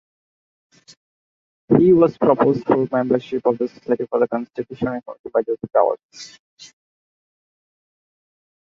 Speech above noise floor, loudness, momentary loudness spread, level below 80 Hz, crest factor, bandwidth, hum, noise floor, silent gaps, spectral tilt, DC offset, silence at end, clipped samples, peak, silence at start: over 71 dB; -19 LUFS; 16 LU; -58 dBFS; 20 dB; 7.6 kHz; none; under -90 dBFS; 5.19-5.24 s, 6.04-6.09 s, 6.39-6.57 s; -8 dB/octave; under 0.1%; 2 s; under 0.1%; 0 dBFS; 1.7 s